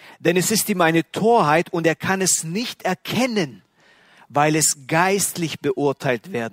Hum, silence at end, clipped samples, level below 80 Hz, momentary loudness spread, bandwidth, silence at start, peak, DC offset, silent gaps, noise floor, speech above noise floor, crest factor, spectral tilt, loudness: none; 0.05 s; under 0.1%; -62 dBFS; 8 LU; 16 kHz; 0.05 s; -2 dBFS; under 0.1%; none; -54 dBFS; 34 dB; 18 dB; -3.5 dB/octave; -20 LUFS